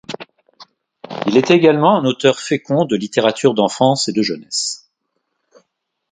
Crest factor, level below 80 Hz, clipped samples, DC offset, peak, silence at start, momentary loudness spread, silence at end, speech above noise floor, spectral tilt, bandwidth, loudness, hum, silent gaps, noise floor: 18 dB; -62 dBFS; under 0.1%; under 0.1%; 0 dBFS; 0.1 s; 12 LU; 1.35 s; 57 dB; -4.5 dB/octave; 9.6 kHz; -15 LUFS; none; none; -72 dBFS